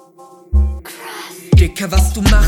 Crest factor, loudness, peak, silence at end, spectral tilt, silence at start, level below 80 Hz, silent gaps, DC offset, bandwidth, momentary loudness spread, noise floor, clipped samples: 14 dB; -15 LUFS; 0 dBFS; 0 s; -5.5 dB/octave; 0.5 s; -16 dBFS; none; under 0.1%; 16.5 kHz; 16 LU; -42 dBFS; under 0.1%